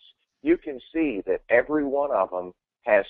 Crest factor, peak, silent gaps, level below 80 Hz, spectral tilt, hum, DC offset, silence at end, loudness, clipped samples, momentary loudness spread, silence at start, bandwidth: 18 dB; -6 dBFS; none; -56 dBFS; -4 dB/octave; none; under 0.1%; 0 s; -25 LUFS; under 0.1%; 11 LU; 0.45 s; 4.1 kHz